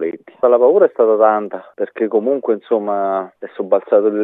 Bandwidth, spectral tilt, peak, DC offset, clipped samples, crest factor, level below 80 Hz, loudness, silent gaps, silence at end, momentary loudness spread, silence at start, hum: 3.9 kHz; -9.5 dB/octave; 0 dBFS; under 0.1%; under 0.1%; 14 dB; -76 dBFS; -16 LUFS; none; 0 s; 13 LU; 0 s; none